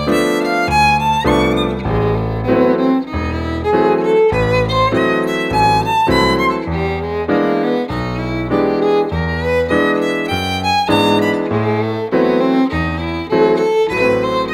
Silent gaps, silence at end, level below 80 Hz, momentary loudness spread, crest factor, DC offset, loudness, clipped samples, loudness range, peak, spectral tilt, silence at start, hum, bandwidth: none; 0 s; -32 dBFS; 6 LU; 14 dB; under 0.1%; -15 LUFS; under 0.1%; 2 LU; 0 dBFS; -6 dB/octave; 0 s; none; 16 kHz